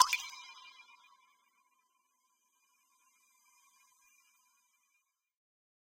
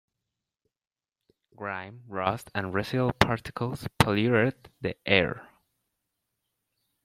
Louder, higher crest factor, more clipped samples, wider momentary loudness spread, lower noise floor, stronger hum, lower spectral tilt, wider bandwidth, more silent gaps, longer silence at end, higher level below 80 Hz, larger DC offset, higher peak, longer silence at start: second, -35 LUFS vs -27 LUFS; first, 36 dB vs 30 dB; neither; first, 27 LU vs 12 LU; second, -81 dBFS vs -86 dBFS; neither; second, 4.5 dB/octave vs -5.5 dB/octave; about the same, 16 kHz vs 16 kHz; neither; first, 5.45 s vs 1.6 s; second, -88 dBFS vs -54 dBFS; neither; second, -6 dBFS vs 0 dBFS; second, 0 s vs 1.6 s